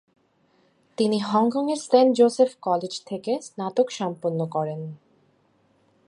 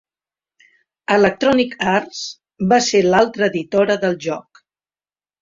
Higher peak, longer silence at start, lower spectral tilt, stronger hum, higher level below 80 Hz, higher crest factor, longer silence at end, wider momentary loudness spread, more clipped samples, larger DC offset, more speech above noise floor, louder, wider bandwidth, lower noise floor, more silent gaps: second, -6 dBFS vs -2 dBFS; about the same, 1 s vs 1.1 s; first, -6 dB/octave vs -4.5 dB/octave; neither; second, -76 dBFS vs -56 dBFS; about the same, 20 dB vs 18 dB; first, 1.15 s vs 1 s; about the same, 12 LU vs 14 LU; neither; neither; second, 41 dB vs over 74 dB; second, -23 LUFS vs -17 LUFS; first, 11 kHz vs 7.8 kHz; second, -64 dBFS vs under -90 dBFS; neither